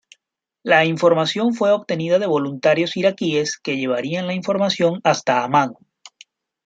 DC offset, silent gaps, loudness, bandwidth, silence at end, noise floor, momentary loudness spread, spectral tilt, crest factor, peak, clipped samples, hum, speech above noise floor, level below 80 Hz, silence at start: under 0.1%; none; -19 LUFS; 9 kHz; 0.6 s; -75 dBFS; 7 LU; -5 dB/octave; 18 dB; -2 dBFS; under 0.1%; none; 56 dB; -66 dBFS; 0.65 s